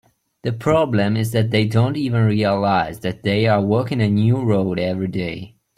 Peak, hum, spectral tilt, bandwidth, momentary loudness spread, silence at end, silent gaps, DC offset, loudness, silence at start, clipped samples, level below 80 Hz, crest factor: -4 dBFS; none; -7.5 dB/octave; 14.5 kHz; 8 LU; 0.3 s; none; under 0.1%; -19 LUFS; 0.45 s; under 0.1%; -50 dBFS; 14 dB